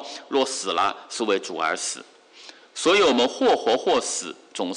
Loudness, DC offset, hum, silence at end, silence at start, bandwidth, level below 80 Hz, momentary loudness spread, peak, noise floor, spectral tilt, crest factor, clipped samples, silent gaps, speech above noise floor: -22 LUFS; under 0.1%; none; 0 s; 0 s; 11.5 kHz; -66 dBFS; 12 LU; -10 dBFS; -47 dBFS; -2 dB/octave; 14 dB; under 0.1%; none; 24 dB